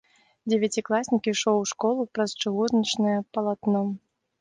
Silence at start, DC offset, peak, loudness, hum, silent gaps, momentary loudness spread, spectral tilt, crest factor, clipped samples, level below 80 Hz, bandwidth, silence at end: 0.45 s; under 0.1%; -10 dBFS; -25 LUFS; none; none; 5 LU; -4.5 dB/octave; 16 dB; under 0.1%; -68 dBFS; 10 kHz; 0.45 s